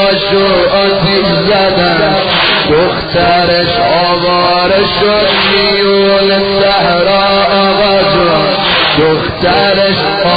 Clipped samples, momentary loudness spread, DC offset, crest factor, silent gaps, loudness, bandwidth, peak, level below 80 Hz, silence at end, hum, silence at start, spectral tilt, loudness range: under 0.1%; 2 LU; under 0.1%; 8 dB; none; -8 LUFS; 5 kHz; 0 dBFS; -34 dBFS; 0 s; none; 0 s; -7 dB/octave; 1 LU